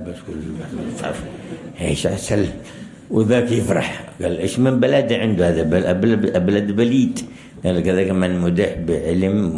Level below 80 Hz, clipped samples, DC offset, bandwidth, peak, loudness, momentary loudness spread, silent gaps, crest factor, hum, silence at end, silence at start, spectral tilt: -44 dBFS; under 0.1%; under 0.1%; 12 kHz; -4 dBFS; -19 LUFS; 14 LU; none; 14 dB; none; 0 s; 0 s; -6.5 dB/octave